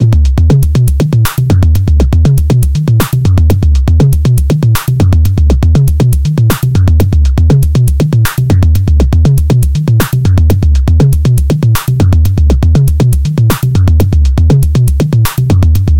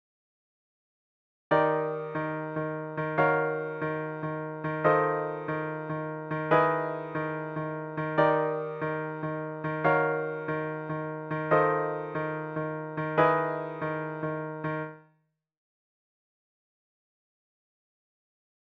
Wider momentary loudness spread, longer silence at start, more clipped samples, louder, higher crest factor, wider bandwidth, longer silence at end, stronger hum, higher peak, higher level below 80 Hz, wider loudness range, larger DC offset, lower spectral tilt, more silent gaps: second, 2 LU vs 10 LU; second, 0 s vs 1.5 s; first, 0.1% vs under 0.1%; first, -9 LUFS vs -29 LUFS; second, 6 dB vs 20 dB; first, 17.5 kHz vs 5.4 kHz; second, 0 s vs 3.75 s; neither; first, 0 dBFS vs -10 dBFS; first, -12 dBFS vs -70 dBFS; second, 0 LU vs 4 LU; neither; second, -7 dB/octave vs -9 dB/octave; neither